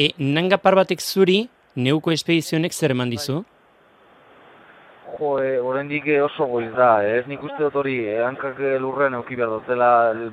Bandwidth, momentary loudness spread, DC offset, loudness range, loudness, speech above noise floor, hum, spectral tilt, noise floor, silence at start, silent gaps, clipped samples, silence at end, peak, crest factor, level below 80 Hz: 16 kHz; 9 LU; under 0.1%; 6 LU; -20 LUFS; 35 dB; none; -5 dB/octave; -55 dBFS; 0 s; none; under 0.1%; 0 s; 0 dBFS; 20 dB; -64 dBFS